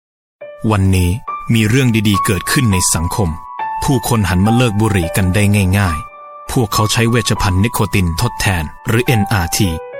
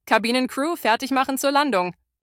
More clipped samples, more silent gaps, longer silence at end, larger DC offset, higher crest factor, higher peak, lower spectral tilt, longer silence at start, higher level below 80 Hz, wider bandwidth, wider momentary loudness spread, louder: neither; neither; second, 0 s vs 0.35 s; neither; second, 12 dB vs 20 dB; about the same, -2 dBFS vs -2 dBFS; first, -5 dB/octave vs -3 dB/octave; first, 0.4 s vs 0.05 s; first, -30 dBFS vs -66 dBFS; about the same, 17 kHz vs 17.5 kHz; about the same, 7 LU vs 5 LU; first, -15 LUFS vs -21 LUFS